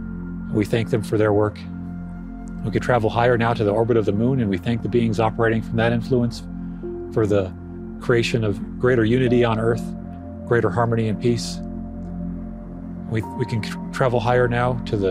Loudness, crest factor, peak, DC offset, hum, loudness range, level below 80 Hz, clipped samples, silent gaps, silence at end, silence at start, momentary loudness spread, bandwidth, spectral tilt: -21 LUFS; 18 dB; -4 dBFS; under 0.1%; none; 5 LU; -40 dBFS; under 0.1%; none; 0 s; 0 s; 14 LU; 12.5 kHz; -7 dB/octave